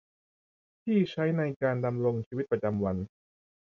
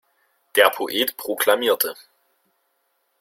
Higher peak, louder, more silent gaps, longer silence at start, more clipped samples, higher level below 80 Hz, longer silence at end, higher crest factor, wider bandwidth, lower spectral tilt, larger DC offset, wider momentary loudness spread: second, -14 dBFS vs -2 dBFS; second, -30 LUFS vs -20 LUFS; first, 1.56-1.60 s, 2.26-2.31 s vs none; first, 0.85 s vs 0.55 s; neither; first, -58 dBFS vs -70 dBFS; second, 0.55 s vs 1.25 s; second, 16 dB vs 22 dB; second, 6.6 kHz vs 16.5 kHz; first, -9 dB/octave vs -0.5 dB/octave; neither; about the same, 7 LU vs 7 LU